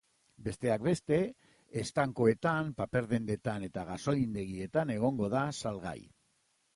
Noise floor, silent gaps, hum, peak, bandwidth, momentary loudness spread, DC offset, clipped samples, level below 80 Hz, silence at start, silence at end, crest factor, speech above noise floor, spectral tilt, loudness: -75 dBFS; none; none; -14 dBFS; 11.5 kHz; 11 LU; under 0.1%; under 0.1%; -60 dBFS; 0.4 s; 0.7 s; 20 dB; 42 dB; -6.5 dB/octave; -33 LUFS